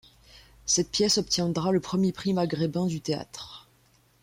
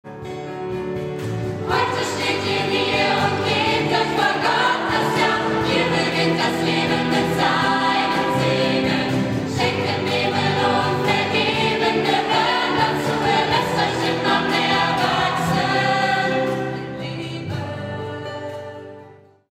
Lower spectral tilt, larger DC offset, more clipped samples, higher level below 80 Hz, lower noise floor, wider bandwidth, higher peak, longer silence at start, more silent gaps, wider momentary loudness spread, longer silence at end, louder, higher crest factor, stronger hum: about the same, -4 dB/octave vs -5 dB/octave; neither; neither; second, -58 dBFS vs -50 dBFS; first, -63 dBFS vs -46 dBFS; about the same, 16.5 kHz vs 16 kHz; second, -12 dBFS vs -4 dBFS; first, 0.35 s vs 0.05 s; neither; first, 14 LU vs 10 LU; first, 0.6 s vs 0.35 s; second, -26 LUFS vs -20 LUFS; about the same, 16 dB vs 16 dB; neither